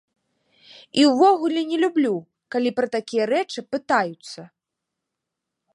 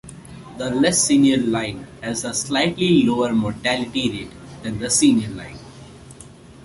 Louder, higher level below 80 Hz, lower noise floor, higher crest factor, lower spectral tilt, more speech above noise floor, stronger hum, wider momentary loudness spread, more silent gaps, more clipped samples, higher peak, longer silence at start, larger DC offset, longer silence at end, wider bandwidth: about the same, -21 LUFS vs -19 LUFS; second, -74 dBFS vs -48 dBFS; first, -83 dBFS vs -43 dBFS; about the same, 18 dB vs 16 dB; about the same, -4.5 dB/octave vs -4 dB/octave; first, 62 dB vs 23 dB; neither; second, 13 LU vs 20 LU; neither; neither; about the same, -4 dBFS vs -4 dBFS; first, 0.95 s vs 0.05 s; neither; first, 1.3 s vs 0 s; about the same, 11.5 kHz vs 11.5 kHz